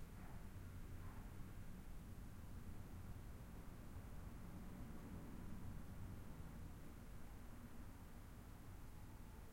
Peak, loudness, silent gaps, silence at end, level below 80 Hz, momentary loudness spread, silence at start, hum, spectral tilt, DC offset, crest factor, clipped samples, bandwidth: -40 dBFS; -58 LUFS; none; 0 s; -58 dBFS; 4 LU; 0 s; none; -6.5 dB/octave; under 0.1%; 14 dB; under 0.1%; 16.5 kHz